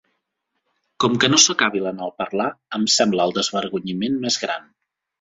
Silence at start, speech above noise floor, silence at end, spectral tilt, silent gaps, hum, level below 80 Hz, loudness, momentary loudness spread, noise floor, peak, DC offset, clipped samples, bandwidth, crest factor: 1 s; 56 dB; 0.6 s; -2.5 dB/octave; none; none; -62 dBFS; -19 LUFS; 13 LU; -76 dBFS; 0 dBFS; under 0.1%; under 0.1%; 8 kHz; 22 dB